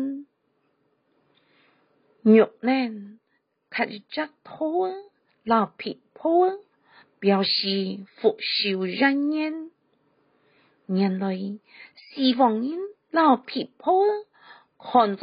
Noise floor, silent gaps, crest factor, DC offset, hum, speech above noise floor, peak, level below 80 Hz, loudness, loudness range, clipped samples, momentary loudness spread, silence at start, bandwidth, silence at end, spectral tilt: -72 dBFS; none; 20 dB; under 0.1%; none; 49 dB; -6 dBFS; -76 dBFS; -24 LUFS; 4 LU; under 0.1%; 15 LU; 0 s; 5.2 kHz; 0.05 s; -3.5 dB/octave